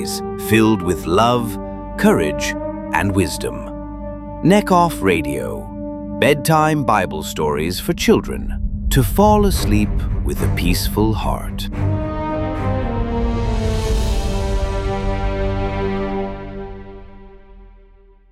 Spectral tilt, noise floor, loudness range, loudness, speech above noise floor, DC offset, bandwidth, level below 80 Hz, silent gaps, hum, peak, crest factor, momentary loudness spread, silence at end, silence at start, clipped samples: -5.5 dB/octave; -47 dBFS; 5 LU; -19 LUFS; 31 dB; under 0.1%; 16 kHz; -26 dBFS; none; none; 0 dBFS; 18 dB; 13 LU; 0.6 s; 0 s; under 0.1%